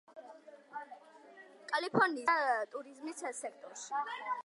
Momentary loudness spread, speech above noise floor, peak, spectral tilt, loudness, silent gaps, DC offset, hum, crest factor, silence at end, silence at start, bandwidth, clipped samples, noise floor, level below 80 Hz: 24 LU; 22 dB; -16 dBFS; -3.5 dB/octave; -35 LUFS; none; under 0.1%; none; 22 dB; 0.05 s; 0.1 s; 11.5 kHz; under 0.1%; -57 dBFS; -88 dBFS